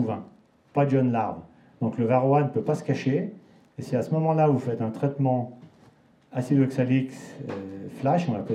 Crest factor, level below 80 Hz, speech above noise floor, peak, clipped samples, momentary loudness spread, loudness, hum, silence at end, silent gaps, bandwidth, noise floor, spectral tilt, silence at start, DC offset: 16 dB; -72 dBFS; 32 dB; -10 dBFS; under 0.1%; 14 LU; -25 LUFS; none; 0 s; none; 10.5 kHz; -57 dBFS; -9 dB/octave; 0 s; under 0.1%